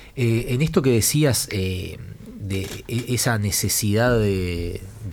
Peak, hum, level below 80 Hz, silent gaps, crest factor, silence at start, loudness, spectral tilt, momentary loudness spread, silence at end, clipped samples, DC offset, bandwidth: -6 dBFS; none; -40 dBFS; none; 16 dB; 0 s; -21 LUFS; -4.5 dB/octave; 14 LU; 0 s; under 0.1%; under 0.1%; 19 kHz